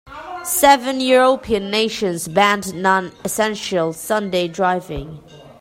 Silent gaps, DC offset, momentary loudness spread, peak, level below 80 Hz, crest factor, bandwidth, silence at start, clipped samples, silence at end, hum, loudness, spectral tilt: none; under 0.1%; 11 LU; 0 dBFS; -46 dBFS; 18 dB; 16.5 kHz; 0.05 s; under 0.1%; 0.1 s; none; -17 LUFS; -3.5 dB/octave